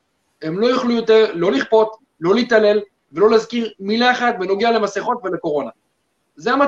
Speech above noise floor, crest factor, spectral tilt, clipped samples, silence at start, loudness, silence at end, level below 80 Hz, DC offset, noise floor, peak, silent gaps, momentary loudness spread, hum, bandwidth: 52 dB; 16 dB; -5 dB/octave; under 0.1%; 0.4 s; -17 LUFS; 0 s; -62 dBFS; under 0.1%; -68 dBFS; -2 dBFS; none; 10 LU; none; 7.6 kHz